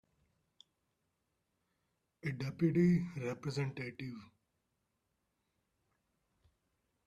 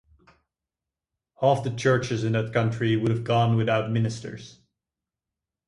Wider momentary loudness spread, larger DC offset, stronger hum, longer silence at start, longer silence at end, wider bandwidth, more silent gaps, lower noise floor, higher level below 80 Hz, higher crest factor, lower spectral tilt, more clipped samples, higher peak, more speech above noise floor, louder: first, 16 LU vs 7 LU; neither; neither; first, 2.25 s vs 1.4 s; first, 2.8 s vs 1.15 s; second, 8.8 kHz vs 11 kHz; neither; second, -84 dBFS vs -88 dBFS; second, -72 dBFS vs -58 dBFS; about the same, 20 dB vs 20 dB; first, -8 dB/octave vs -6.5 dB/octave; neither; second, -20 dBFS vs -6 dBFS; second, 49 dB vs 65 dB; second, -36 LUFS vs -24 LUFS